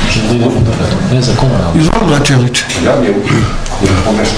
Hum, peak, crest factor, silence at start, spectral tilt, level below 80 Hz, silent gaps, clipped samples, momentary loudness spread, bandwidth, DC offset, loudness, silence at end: none; 0 dBFS; 10 dB; 0 s; -5.5 dB/octave; -20 dBFS; none; 0.3%; 3 LU; 11 kHz; under 0.1%; -11 LUFS; 0 s